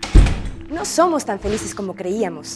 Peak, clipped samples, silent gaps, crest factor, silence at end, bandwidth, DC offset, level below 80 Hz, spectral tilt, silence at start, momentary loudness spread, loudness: 0 dBFS; under 0.1%; none; 18 dB; 0 s; 12.5 kHz; under 0.1%; -22 dBFS; -5.5 dB/octave; 0 s; 11 LU; -21 LUFS